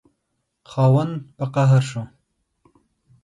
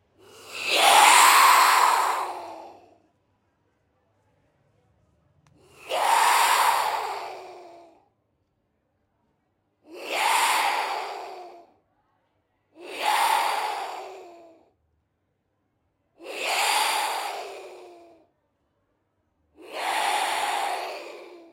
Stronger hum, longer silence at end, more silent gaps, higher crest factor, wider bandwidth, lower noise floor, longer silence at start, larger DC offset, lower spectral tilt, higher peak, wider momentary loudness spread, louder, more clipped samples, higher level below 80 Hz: neither; first, 1.15 s vs 0.15 s; neither; second, 16 dB vs 24 dB; second, 11 kHz vs 16.5 kHz; about the same, -75 dBFS vs -74 dBFS; first, 0.7 s vs 0.45 s; neither; first, -8 dB/octave vs 1.5 dB/octave; second, -6 dBFS vs -2 dBFS; second, 15 LU vs 24 LU; about the same, -20 LUFS vs -21 LUFS; neither; first, -60 dBFS vs -78 dBFS